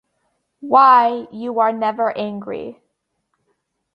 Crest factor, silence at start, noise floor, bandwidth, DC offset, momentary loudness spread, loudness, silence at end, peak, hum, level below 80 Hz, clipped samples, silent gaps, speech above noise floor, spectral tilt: 18 dB; 0.6 s; -72 dBFS; 5.6 kHz; under 0.1%; 19 LU; -16 LUFS; 1.2 s; -2 dBFS; none; -68 dBFS; under 0.1%; none; 55 dB; -7 dB/octave